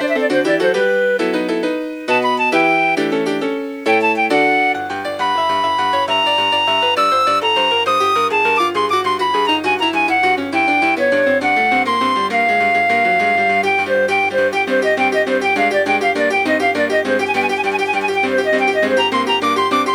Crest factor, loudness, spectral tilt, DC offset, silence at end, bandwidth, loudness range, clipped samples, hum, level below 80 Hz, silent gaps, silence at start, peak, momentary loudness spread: 14 dB; -15 LUFS; -3.5 dB/octave; under 0.1%; 0 s; over 20 kHz; 2 LU; under 0.1%; none; -64 dBFS; none; 0 s; -2 dBFS; 4 LU